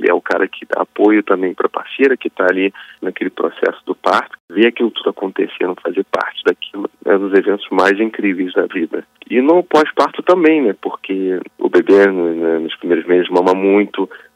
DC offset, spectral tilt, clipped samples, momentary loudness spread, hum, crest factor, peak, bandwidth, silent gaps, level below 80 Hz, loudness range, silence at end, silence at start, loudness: under 0.1%; -6 dB/octave; under 0.1%; 9 LU; none; 14 dB; 0 dBFS; 9.8 kHz; 4.40-4.48 s; -68 dBFS; 4 LU; 0.2 s; 0 s; -15 LUFS